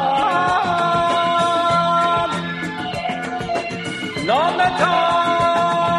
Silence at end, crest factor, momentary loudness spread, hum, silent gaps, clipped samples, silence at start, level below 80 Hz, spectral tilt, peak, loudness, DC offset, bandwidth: 0 s; 14 dB; 8 LU; none; none; under 0.1%; 0 s; -50 dBFS; -4.5 dB/octave; -4 dBFS; -18 LUFS; under 0.1%; 12 kHz